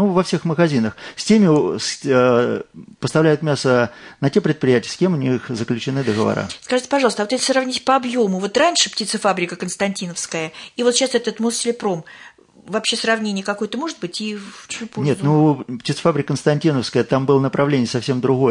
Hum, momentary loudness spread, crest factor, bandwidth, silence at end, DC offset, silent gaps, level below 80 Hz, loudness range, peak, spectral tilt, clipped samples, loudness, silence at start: none; 10 LU; 16 dB; 11 kHz; 0 s; under 0.1%; none; -60 dBFS; 4 LU; -2 dBFS; -5 dB/octave; under 0.1%; -19 LUFS; 0 s